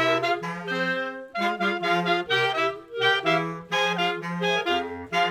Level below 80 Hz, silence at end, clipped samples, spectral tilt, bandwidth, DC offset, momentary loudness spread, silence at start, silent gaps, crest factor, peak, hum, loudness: -66 dBFS; 0 s; under 0.1%; -4.5 dB/octave; 15 kHz; under 0.1%; 6 LU; 0 s; none; 16 dB; -10 dBFS; none; -25 LUFS